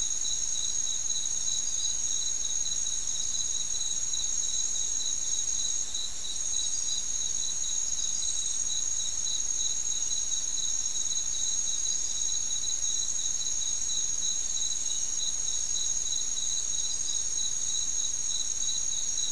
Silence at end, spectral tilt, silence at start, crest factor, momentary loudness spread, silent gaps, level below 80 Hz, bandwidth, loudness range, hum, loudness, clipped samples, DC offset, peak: 0 s; 2 dB/octave; 0 s; 14 dB; 1 LU; none; -54 dBFS; 12 kHz; 1 LU; none; -27 LUFS; under 0.1%; 2%; -16 dBFS